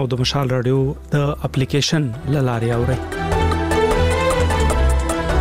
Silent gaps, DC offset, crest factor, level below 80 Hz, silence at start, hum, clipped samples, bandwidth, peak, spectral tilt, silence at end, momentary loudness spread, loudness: none; 0.3%; 12 dB; -24 dBFS; 0 s; none; under 0.1%; 15.5 kHz; -6 dBFS; -5.5 dB/octave; 0 s; 4 LU; -19 LUFS